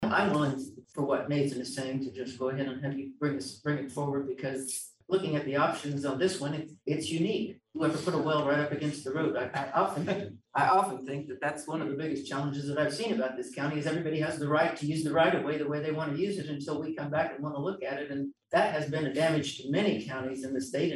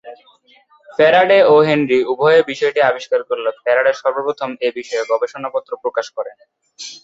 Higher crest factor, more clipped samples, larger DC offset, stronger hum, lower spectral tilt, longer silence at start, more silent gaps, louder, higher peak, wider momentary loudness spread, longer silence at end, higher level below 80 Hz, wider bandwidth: about the same, 18 dB vs 16 dB; neither; neither; neither; about the same, -5.5 dB/octave vs -5 dB/octave; about the same, 0 s vs 0.05 s; neither; second, -31 LUFS vs -15 LUFS; second, -14 dBFS vs -2 dBFS; second, 8 LU vs 14 LU; about the same, 0 s vs 0.05 s; second, -72 dBFS vs -64 dBFS; first, 12.5 kHz vs 7.8 kHz